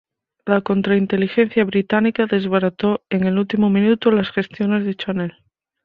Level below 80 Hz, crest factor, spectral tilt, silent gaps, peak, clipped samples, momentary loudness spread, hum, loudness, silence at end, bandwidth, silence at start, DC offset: -56 dBFS; 16 dB; -9 dB/octave; none; -2 dBFS; under 0.1%; 7 LU; none; -18 LUFS; 0.55 s; 5 kHz; 0.45 s; under 0.1%